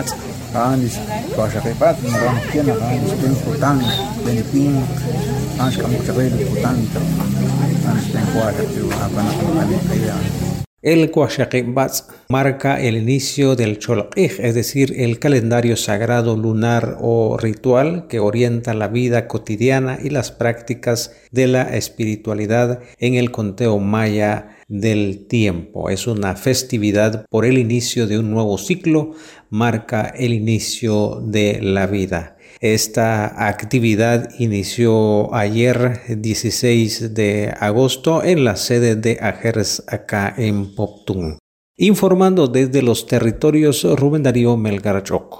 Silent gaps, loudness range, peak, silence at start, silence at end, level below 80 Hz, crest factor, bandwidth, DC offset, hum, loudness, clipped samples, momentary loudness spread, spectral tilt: 10.67-10.77 s, 41.40-41.74 s; 2 LU; -2 dBFS; 0 s; 0 s; -42 dBFS; 14 dB; 16.5 kHz; under 0.1%; none; -17 LUFS; under 0.1%; 6 LU; -6 dB/octave